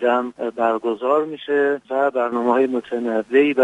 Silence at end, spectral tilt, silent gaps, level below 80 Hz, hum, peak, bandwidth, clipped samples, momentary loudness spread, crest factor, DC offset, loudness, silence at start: 0 s; -6 dB/octave; none; -68 dBFS; none; -4 dBFS; 8.2 kHz; under 0.1%; 5 LU; 14 dB; under 0.1%; -20 LUFS; 0 s